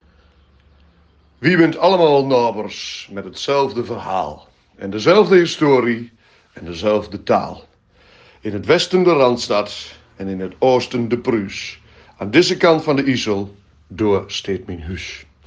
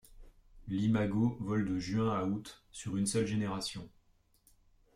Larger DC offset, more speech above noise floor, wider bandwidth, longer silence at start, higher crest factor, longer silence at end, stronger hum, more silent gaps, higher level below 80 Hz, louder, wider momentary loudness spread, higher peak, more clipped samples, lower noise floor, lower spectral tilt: neither; about the same, 36 dB vs 36 dB; second, 9.6 kHz vs 14.5 kHz; first, 1.4 s vs 0.1 s; about the same, 18 dB vs 16 dB; second, 0.25 s vs 1.1 s; neither; neither; first, -52 dBFS vs -58 dBFS; first, -17 LUFS vs -34 LUFS; first, 17 LU vs 12 LU; first, 0 dBFS vs -20 dBFS; neither; second, -53 dBFS vs -69 dBFS; about the same, -5.5 dB/octave vs -6 dB/octave